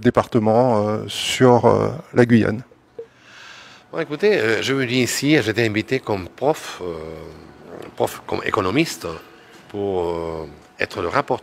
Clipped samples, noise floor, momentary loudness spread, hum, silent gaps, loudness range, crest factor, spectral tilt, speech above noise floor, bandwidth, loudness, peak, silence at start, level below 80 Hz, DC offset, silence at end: under 0.1%; -44 dBFS; 22 LU; none; none; 6 LU; 20 dB; -5.5 dB/octave; 24 dB; 16 kHz; -20 LUFS; 0 dBFS; 0 s; -52 dBFS; under 0.1%; 0 s